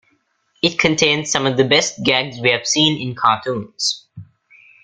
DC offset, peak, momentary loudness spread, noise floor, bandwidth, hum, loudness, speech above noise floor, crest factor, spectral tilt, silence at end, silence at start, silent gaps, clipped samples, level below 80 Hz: under 0.1%; 0 dBFS; 6 LU; -63 dBFS; 11 kHz; none; -16 LUFS; 46 dB; 18 dB; -3 dB/octave; 0.6 s; 0.65 s; none; under 0.1%; -54 dBFS